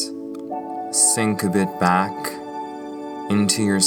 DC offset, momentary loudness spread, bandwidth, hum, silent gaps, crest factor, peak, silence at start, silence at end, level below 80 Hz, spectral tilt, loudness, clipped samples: under 0.1%; 16 LU; over 20 kHz; none; none; 20 dB; -2 dBFS; 0 s; 0 s; -64 dBFS; -3.5 dB/octave; -20 LUFS; under 0.1%